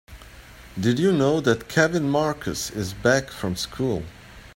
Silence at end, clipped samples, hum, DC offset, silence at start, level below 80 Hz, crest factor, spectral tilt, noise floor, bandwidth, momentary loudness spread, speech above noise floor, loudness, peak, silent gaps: 0.05 s; under 0.1%; none; under 0.1%; 0.1 s; -48 dBFS; 20 dB; -5 dB/octave; -45 dBFS; 16.5 kHz; 9 LU; 22 dB; -23 LUFS; -2 dBFS; none